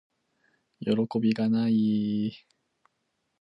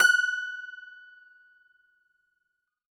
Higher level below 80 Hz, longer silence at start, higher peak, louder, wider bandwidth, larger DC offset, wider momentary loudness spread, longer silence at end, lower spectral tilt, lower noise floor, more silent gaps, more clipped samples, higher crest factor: first, -70 dBFS vs under -90 dBFS; first, 0.8 s vs 0 s; second, -12 dBFS vs -8 dBFS; about the same, -27 LUFS vs -26 LUFS; second, 5.8 kHz vs 17.5 kHz; neither; second, 8 LU vs 25 LU; second, 1.05 s vs 2.05 s; first, -8.5 dB/octave vs 3 dB/octave; about the same, -78 dBFS vs -80 dBFS; neither; neither; second, 16 dB vs 22 dB